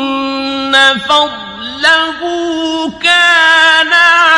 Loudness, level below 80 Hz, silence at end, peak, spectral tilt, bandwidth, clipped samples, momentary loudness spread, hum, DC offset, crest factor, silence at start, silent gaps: -9 LUFS; -50 dBFS; 0 s; 0 dBFS; -1.5 dB/octave; 11.5 kHz; 0.3%; 11 LU; none; under 0.1%; 10 dB; 0 s; none